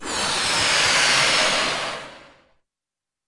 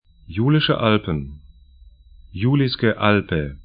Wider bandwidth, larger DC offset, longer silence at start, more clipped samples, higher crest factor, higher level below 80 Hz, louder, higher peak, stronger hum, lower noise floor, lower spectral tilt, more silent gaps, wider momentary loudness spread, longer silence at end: first, 11.5 kHz vs 5.2 kHz; neither; second, 0 s vs 0.3 s; neither; about the same, 16 dB vs 20 dB; second, -52 dBFS vs -42 dBFS; about the same, -18 LUFS vs -19 LUFS; second, -6 dBFS vs 0 dBFS; neither; first, -88 dBFS vs -48 dBFS; second, -0.5 dB/octave vs -11.5 dB/octave; neither; about the same, 11 LU vs 13 LU; first, 1.05 s vs 0 s